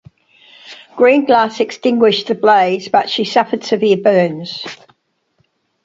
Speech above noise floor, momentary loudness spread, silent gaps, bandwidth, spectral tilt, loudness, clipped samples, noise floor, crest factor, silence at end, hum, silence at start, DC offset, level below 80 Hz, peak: 49 dB; 13 LU; none; 7.8 kHz; -5 dB/octave; -14 LUFS; under 0.1%; -63 dBFS; 14 dB; 1.1 s; none; 0.65 s; under 0.1%; -62 dBFS; 0 dBFS